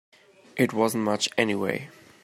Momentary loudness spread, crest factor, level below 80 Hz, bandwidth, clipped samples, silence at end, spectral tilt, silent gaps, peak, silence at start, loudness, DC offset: 13 LU; 22 dB; -70 dBFS; 16 kHz; under 0.1%; 0.35 s; -4 dB/octave; none; -6 dBFS; 0.55 s; -25 LUFS; under 0.1%